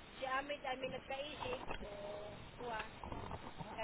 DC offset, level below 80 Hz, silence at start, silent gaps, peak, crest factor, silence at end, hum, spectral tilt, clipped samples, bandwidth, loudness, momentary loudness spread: under 0.1%; -60 dBFS; 0 s; none; -28 dBFS; 18 dB; 0 s; none; -2.5 dB/octave; under 0.1%; 4 kHz; -45 LUFS; 8 LU